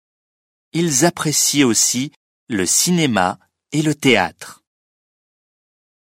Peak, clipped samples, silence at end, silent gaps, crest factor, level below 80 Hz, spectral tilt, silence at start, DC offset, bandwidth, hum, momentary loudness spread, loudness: 0 dBFS; under 0.1%; 1.6 s; 2.16-2.47 s; 20 dB; -58 dBFS; -3 dB/octave; 0.75 s; under 0.1%; 16.5 kHz; none; 12 LU; -16 LUFS